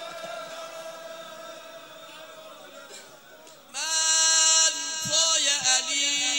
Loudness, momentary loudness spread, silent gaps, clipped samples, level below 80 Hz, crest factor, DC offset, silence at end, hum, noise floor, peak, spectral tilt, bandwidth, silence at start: -20 LUFS; 26 LU; none; under 0.1%; -76 dBFS; 20 dB; under 0.1%; 0 s; none; -49 dBFS; -6 dBFS; 2 dB/octave; 16 kHz; 0 s